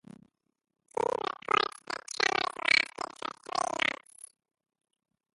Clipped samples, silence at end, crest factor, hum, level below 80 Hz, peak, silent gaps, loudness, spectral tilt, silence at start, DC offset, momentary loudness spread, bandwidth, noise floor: under 0.1%; 1.5 s; 26 dB; none; -74 dBFS; -8 dBFS; none; -30 LUFS; -1 dB/octave; 0.95 s; under 0.1%; 16 LU; 11.5 kHz; -62 dBFS